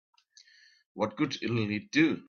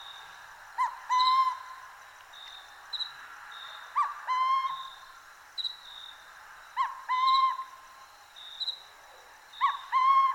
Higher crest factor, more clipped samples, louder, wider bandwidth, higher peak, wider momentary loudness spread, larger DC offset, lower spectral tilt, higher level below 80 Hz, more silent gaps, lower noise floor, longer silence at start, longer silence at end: about the same, 20 dB vs 18 dB; neither; about the same, -30 LUFS vs -29 LUFS; second, 7 kHz vs 16.5 kHz; about the same, -12 dBFS vs -14 dBFS; second, 8 LU vs 25 LU; neither; first, -5.5 dB/octave vs 2 dB/octave; about the same, -70 dBFS vs -74 dBFS; neither; first, -60 dBFS vs -53 dBFS; first, 0.95 s vs 0 s; about the same, 0.1 s vs 0 s